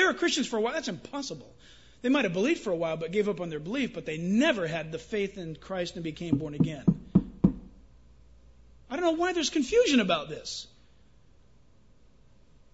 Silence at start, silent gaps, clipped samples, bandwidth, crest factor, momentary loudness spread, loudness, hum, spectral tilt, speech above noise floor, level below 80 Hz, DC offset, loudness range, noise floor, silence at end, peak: 0 s; none; under 0.1%; 8 kHz; 22 dB; 12 LU; -29 LUFS; none; -5 dB/octave; 32 dB; -54 dBFS; 0.1%; 2 LU; -61 dBFS; 2.05 s; -8 dBFS